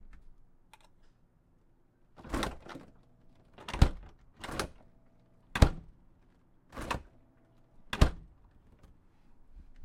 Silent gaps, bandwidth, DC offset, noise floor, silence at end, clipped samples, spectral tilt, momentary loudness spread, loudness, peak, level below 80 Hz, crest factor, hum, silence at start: none; 16.5 kHz; under 0.1%; -66 dBFS; 0 s; under 0.1%; -5.5 dB/octave; 22 LU; -33 LUFS; -6 dBFS; -38 dBFS; 30 dB; none; 2.2 s